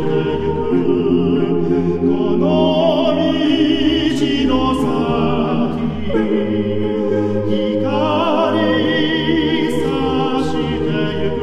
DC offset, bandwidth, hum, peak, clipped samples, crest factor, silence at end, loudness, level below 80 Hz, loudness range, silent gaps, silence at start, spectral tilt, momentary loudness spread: under 0.1%; 12 kHz; none; -2 dBFS; under 0.1%; 14 dB; 0 s; -16 LUFS; -38 dBFS; 2 LU; none; 0 s; -7 dB/octave; 4 LU